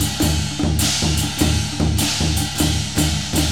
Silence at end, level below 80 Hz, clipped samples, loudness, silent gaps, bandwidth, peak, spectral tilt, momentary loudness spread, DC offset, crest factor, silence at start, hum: 0 s; -28 dBFS; under 0.1%; -19 LUFS; none; 20 kHz; -2 dBFS; -3.5 dB/octave; 2 LU; 1%; 16 dB; 0 s; none